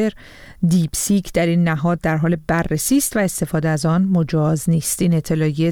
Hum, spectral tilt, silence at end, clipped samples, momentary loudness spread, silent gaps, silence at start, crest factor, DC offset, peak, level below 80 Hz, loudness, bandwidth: none; -5.5 dB/octave; 0 s; under 0.1%; 3 LU; none; 0 s; 12 dB; under 0.1%; -4 dBFS; -40 dBFS; -18 LUFS; 18.5 kHz